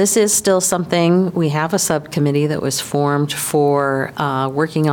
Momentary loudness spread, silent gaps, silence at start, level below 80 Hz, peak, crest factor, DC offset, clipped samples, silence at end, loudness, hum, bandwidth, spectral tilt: 6 LU; none; 0 s; -54 dBFS; -4 dBFS; 12 dB; under 0.1%; under 0.1%; 0 s; -17 LUFS; none; 18 kHz; -4.5 dB/octave